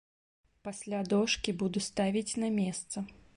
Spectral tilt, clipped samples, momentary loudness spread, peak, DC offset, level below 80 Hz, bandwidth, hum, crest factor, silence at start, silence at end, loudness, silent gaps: -4.5 dB/octave; under 0.1%; 12 LU; -14 dBFS; under 0.1%; -62 dBFS; 11.5 kHz; none; 18 dB; 0.65 s; 0.25 s; -32 LUFS; none